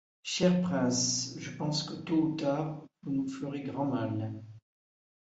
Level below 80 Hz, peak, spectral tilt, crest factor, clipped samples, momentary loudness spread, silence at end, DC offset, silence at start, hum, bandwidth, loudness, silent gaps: -68 dBFS; -12 dBFS; -4.5 dB/octave; 20 dB; under 0.1%; 10 LU; 0.6 s; under 0.1%; 0.25 s; none; 8 kHz; -32 LUFS; none